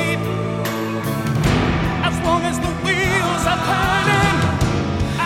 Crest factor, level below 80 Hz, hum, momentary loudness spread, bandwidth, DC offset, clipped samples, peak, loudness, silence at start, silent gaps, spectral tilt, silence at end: 16 dB; -32 dBFS; none; 6 LU; 17 kHz; under 0.1%; under 0.1%; -4 dBFS; -19 LUFS; 0 s; none; -5 dB/octave; 0 s